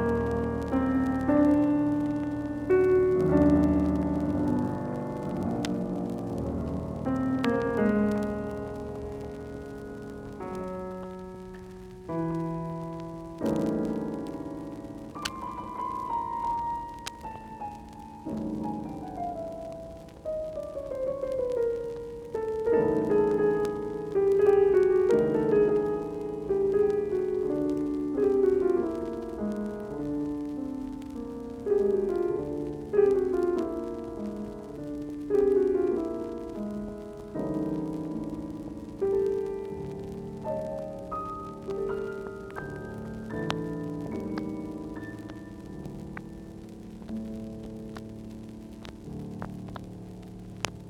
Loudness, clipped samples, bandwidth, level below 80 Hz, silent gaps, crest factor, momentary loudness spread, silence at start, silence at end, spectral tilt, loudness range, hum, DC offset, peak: -29 LUFS; under 0.1%; 12.5 kHz; -48 dBFS; none; 22 dB; 17 LU; 0 s; 0 s; -7.5 dB/octave; 13 LU; none; under 0.1%; -6 dBFS